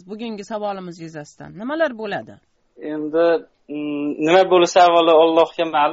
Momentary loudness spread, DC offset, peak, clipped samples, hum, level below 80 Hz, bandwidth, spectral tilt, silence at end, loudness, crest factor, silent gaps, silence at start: 20 LU; under 0.1%; -2 dBFS; under 0.1%; none; -64 dBFS; 8 kHz; -2.5 dB/octave; 0 s; -17 LUFS; 16 dB; none; 0.1 s